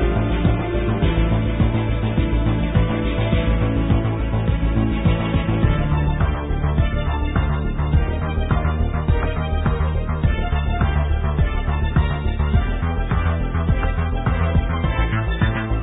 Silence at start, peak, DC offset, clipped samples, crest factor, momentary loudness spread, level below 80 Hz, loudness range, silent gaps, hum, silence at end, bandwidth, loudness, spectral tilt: 0 s; -4 dBFS; under 0.1%; under 0.1%; 16 dB; 3 LU; -22 dBFS; 1 LU; none; none; 0 s; 4 kHz; -21 LUFS; -12.5 dB/octave